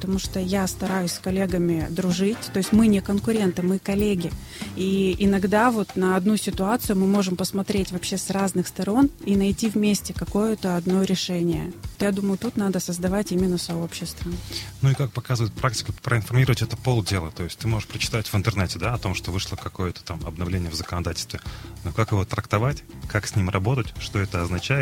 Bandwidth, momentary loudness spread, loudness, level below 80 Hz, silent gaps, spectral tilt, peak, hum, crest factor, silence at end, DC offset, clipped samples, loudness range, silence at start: 16.5 kHz; 9 LU; -24 LUFS; -42 dBFS; none; -5.5 dB/octave; -4 dBFS; none; 20 dB; 0 s; under 0.1%; under 0.1%; 5 LU; 0 s